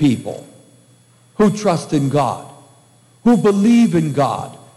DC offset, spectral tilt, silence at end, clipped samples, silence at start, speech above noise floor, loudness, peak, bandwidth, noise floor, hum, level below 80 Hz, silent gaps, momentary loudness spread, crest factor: under 0.1%; -7 dB/octave; 0.2 s; under 0.1%; 0 s; 36 dB; -16 LUFS; -2 dBFS; 12.5 kHz; -51 dBFS; none; -54 dBFS; none; 17 LU; 14 dB